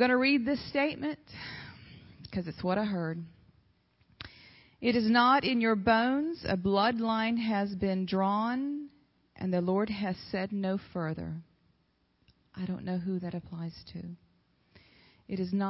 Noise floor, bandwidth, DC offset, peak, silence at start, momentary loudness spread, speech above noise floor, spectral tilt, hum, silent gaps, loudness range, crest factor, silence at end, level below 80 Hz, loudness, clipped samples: -72 dBFS; 5.8 kHz; under 0.1%; -12 dBFS; 0 s; 19 LU; 43 dB; -10 dB/octave; none; none; 12 LU; 18 dB; 0 s; -60 dBFS; -30 LUFS; under 0.1%